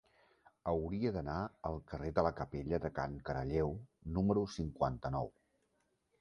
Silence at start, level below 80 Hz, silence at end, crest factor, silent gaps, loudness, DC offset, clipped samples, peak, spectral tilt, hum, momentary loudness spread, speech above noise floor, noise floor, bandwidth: 0.65 s; -52 dBFS; 0.9 s; 22 dB; none; -38 LUFS; under 0.1%; under 0.1%; -16 dBFS; -8 dB/octave; none; 8 LU; 42 dB; -80 dBFS; 10.5 kHz